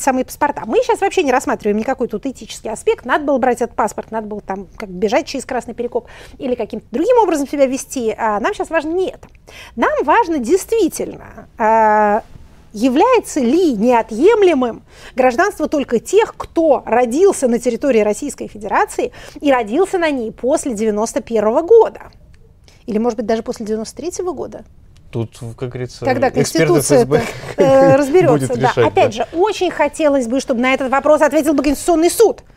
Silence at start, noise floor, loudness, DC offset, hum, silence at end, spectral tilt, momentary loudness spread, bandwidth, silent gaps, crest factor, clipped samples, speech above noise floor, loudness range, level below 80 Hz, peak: 0 s; -45 dBFS; -16 LUFS; under 0.1%; none; 0.2 s; -5 dB/octave; 13 LU; 16 kHz; none; 14 dB; under 0.1%; 29 dB; 6 LU; -44 dBFS; 0 dBFS